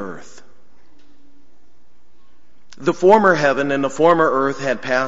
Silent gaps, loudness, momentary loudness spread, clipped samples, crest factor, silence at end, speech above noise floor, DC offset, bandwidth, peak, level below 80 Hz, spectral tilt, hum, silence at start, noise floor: none; -16 LUFS; 11 LU; under 0.1%; 18 dB; 0 s; 43 dB; 2%; 8 kHz; -2 dBFS; -60 dBFS; -5.5 dB/octave; none; 0 s; -60 dBFS